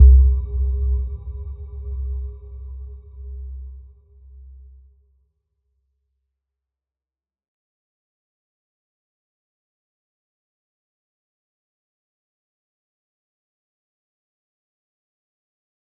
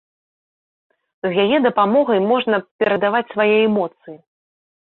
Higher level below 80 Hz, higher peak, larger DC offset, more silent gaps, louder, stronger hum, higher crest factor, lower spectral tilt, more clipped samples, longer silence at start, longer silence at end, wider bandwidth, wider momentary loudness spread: first, -24 dBFS vs -64 dBFS; about the same, -2 dBFS vs -4 dBFS; neither; second, none vs 2.71-2.79 s; second, -23 LUFS vs -17 LUFS; neither; first, 24 dB vs 16 dB; first, -14.5 dB/octave vs -9.5 dB/octave; neither; second, 0 s vs 1.25 s; first, 12.15 s vs 0.7 s; second, 1.1 kHz vs 4.2 kHz; first, 20 LU vs 7 LU